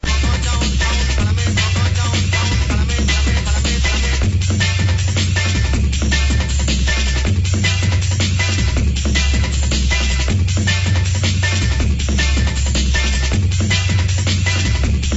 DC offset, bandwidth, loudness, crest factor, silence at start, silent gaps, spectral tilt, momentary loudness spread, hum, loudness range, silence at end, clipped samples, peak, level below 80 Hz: under 0.1%; 8 kHz; -17 LUFS; 12 dB; 0 s; none; -4 dB/octave; 1 LU; none; 0 LU; 0 s; under 0.1%; -2 dBFS; -18 dBFS